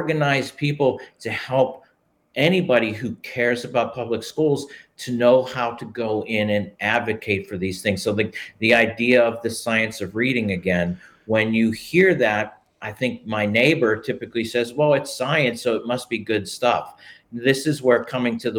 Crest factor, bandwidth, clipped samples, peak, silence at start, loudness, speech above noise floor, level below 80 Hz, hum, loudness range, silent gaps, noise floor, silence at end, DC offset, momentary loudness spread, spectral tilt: 18 dB; 18.5 kHz; under 0.1%; -4 dBFS; 0 s; -21 LUFS; 42 dB; -62 dBFS; none; 2 LU; none; -63 dBFS; 0 s; under 0.1%; 10 LU; -5.5 dB/octave